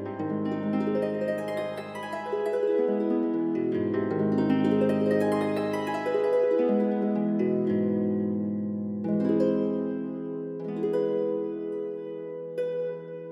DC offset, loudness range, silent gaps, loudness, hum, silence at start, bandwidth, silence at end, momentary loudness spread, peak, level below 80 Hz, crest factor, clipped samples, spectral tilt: under 0.1%; 4 LU; none; -28 LUFS; none; 0 s; 12.5 kHz; 0 s; 10 LU; -12 dBFS; -80 dBFS; 14 dB; under 0.1%; -8.5 dB/octave